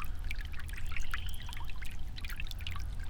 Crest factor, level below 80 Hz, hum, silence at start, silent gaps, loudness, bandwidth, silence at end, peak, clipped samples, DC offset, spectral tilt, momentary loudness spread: 14 dB; -38 dBFS; none; 0 s; none; -42 LUFS; 18 kHz; 0 s; -20 dBFS; under 0.1%; under 0.1%; -3.5 dB/octave; 4 LU